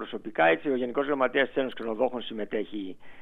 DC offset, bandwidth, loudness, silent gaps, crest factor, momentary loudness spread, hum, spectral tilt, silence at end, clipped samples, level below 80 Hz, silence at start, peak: under 0.1%; 4.4 kHz; -28 LUFS; none; 18 dB; 11 LU; none; -7 dB/octave; 0 s; under 0.1%; -66 dBFS; 0 s; -10 dBFS